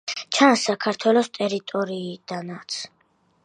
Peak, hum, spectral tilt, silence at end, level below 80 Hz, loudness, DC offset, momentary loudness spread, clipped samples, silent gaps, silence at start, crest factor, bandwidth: -2 dBFS; none; -3.5 dB/octave; 0.55 s; -76 dBFS; -23 LUFS; under 0.1%; 15 LU; under 0.1%; none; 0.05 s; 22 dB; 10.5 kHz